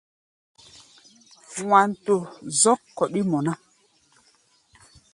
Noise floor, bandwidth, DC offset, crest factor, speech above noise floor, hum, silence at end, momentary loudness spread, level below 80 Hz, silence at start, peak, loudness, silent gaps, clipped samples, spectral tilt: -62 dBFS; 11.5 kHz; under 0.1%; 22 dB; 40 dB; none; 1.6 s; 13 LU; -68 dBFS; 1.5 s; -4 dBFS; -22 LUFS; none; under 0.1%; -4 dB/octave